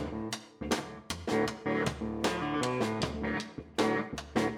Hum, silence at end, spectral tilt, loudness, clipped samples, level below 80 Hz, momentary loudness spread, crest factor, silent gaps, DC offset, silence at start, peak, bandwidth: none; 0 s; -4.5 dB/octave; -33 LUFS; under 0.1%; -52 dBFS; 7 LU; 18 dB; none; under 0.1%; 0 s; -16 dBFS; 16 kHz